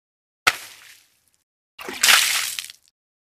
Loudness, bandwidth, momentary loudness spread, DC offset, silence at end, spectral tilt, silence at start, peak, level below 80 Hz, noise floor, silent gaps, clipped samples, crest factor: -18 LUFS; 15.5 kHz; 24 LU; under 0.1%; 0.5 s; 2.5 dB/octave; 0.45 s; -2 dBFS; -66 dBFS; -58 dBFS; 1.43-1.78 s; under 0.1%; 24 dB